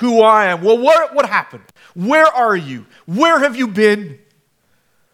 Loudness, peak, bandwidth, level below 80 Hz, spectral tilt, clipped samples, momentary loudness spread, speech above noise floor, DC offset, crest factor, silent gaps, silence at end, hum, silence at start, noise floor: -13 LUFS; 0 dBFS; 15 kHz; -70 dBFS; -5 dB/octave; under 0.1%; 15 LU; 47 dB; under 0.1%; 14 dB; none; 1 s; none; 0 s; -60 dBFS